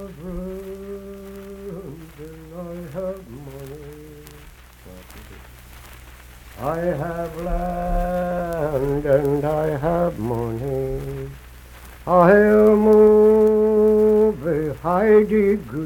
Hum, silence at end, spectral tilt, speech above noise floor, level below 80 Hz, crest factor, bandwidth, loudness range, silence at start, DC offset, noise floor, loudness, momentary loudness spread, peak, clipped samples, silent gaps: none; 0 s; -8 dB/octave; 26 dB; -38 dBFS; 18 dB; 17.5 kHz; 20 LU; 0 s; under 0.1%; -44 dBFS; -18 LUFS; 23 LU; -2 dBFS; under 0.1%; none